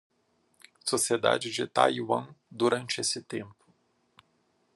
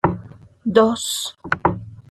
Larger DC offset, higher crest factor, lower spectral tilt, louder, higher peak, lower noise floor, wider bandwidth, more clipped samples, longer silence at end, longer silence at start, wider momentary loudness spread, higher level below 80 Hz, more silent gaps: neither; first, 24 dB vs 18 dB; second, -3 dB/octave vs -4.5 dB/octave; second, -28 LUFS vs -20 LUFS; second, -6 dBFS vs -2 dBFS; first, -71 dBFS vs -40 dBFS; second, 12.5 kHz vs 14 kHz; neither; first, 1.25 s vs 0.15 s; first, 0.85 s vs 0.05 s; about the same, 14 LU vs 14 LU; second, -80 dBFS vs -48 dBFS; neither